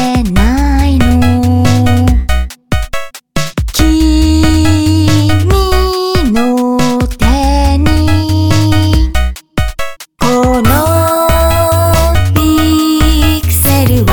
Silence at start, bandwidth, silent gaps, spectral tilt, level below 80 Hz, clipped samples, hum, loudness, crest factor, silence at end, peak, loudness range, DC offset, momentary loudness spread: 0 s; 19.5 kHz; none; -5.5 dB/octave; -16 dBFS; under 0.1%; none; -10 LUFS; 10 dB; 0 s; 0 dBFS; 2 LU; 5%; 8 LU